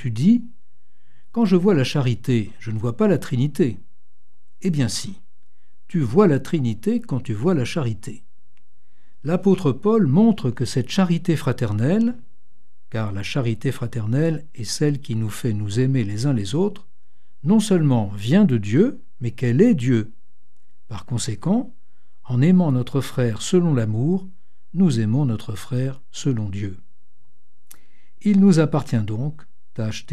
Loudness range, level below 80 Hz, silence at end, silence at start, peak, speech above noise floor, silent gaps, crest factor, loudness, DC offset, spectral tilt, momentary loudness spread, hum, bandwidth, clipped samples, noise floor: 5 LU; -56 dBFS; 0.1 s; 0 s; -2 dBFS; 52 dB; none; 18 dB; -21 LUFS; 3%; -7 dB/octave; 12 LU; none; 13.5 kHz; under 0.1%; -71 dBFS